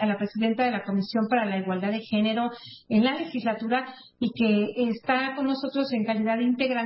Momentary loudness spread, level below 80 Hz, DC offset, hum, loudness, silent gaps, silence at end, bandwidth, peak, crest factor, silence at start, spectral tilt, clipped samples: 5 LU; -70 dBFS; under 0.1%; none; -26 LUFS; none; 0 s; 5.8 kHz; -10 dBFS; 16 dB; 0 s; -10.5 dB/octave; under 0.1%